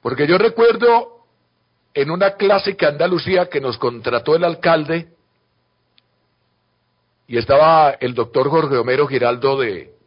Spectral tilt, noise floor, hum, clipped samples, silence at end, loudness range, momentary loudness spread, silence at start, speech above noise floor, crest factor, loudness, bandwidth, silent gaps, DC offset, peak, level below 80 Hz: -10.5 dB/octave; -66 dBFS; 60 Hz at -50 dBFS; under 0.1%; 0.2 s; 5 LU; 10 LU; 0.05 s; 50 dB; 14 dB; -16 LUFS; 5.4 kHz; none; under 0.1%; -2 dBFS; -54 dBFS